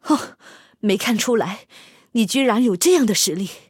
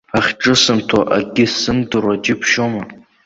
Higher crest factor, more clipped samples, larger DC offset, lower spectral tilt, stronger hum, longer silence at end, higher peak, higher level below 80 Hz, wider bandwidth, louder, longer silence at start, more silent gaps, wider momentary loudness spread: about the same, 16 dB vs 16 dB; neither; neither; about the same, -3.5 dB/octave vs -3.5 dB/octave; neither; second, 0.1 s vs 0.3 s; second, -4 dBFS vs 0 dBFS; second, -68 dBFS vs -46 dBFS; first, 17 kHz vs 8 kHz; second, -19 LUFS vs -15 LUFS; about the same, 0.05 s vs 0.15 s; neither; first, 11 LU vs 6 LU